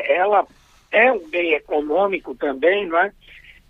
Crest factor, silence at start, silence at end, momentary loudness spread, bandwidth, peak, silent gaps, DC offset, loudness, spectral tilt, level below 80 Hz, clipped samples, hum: 16 dB; 0 s; 0.3 s; 8 LU; 6.8 kHz; -2 dBFS; none; under 0.1%; -19 LUFS; -5.5 dB/octave; -56 dBFS; under 0.1%; none